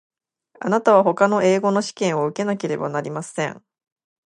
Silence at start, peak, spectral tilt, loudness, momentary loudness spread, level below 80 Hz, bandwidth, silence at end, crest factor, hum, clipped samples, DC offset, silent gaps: 0.6 s; -2 dBFS; -5.5 dB/octave; -20 LUFS; 11 LU; -72 dBFS; 11 kHz; 0.7 s; 20 dB; none; under 0.1%; under 0.1%; none